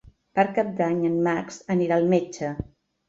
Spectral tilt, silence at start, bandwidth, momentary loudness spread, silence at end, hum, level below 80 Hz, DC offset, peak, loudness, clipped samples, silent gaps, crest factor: -7 dB/octave; 0.35 s; 7.8 kHz; 10 LU; 0.45 s; none; -54 dBFS; under 0.1%; -6 dBFS; -24 LUFS; under 0.1%; none; 18 dB